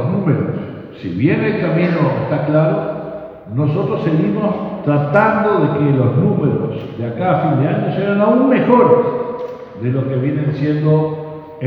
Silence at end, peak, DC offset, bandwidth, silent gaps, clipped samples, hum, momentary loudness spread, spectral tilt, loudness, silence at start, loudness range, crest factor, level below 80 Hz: 0 s; 0 dBFS; under 0.1%; 5 kHz; none; under 0.1%; none; 12 LU; -10.5 dB/octave; -16 LUFS; 0 s; 3 LU; 16 dB; -54 dBFS